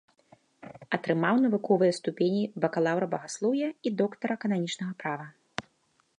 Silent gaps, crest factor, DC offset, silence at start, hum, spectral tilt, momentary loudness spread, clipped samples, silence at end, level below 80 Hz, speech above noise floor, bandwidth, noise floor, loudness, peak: none; 18 dB; under 0.1%; 0.65 s; none; -6 dB/octave; 15 LU; under 0.1%; 0.6 s; -76 dBFS; 43 dB; 10.5 kHz; -70 dBFS; -28 LUFS; -10 dBFS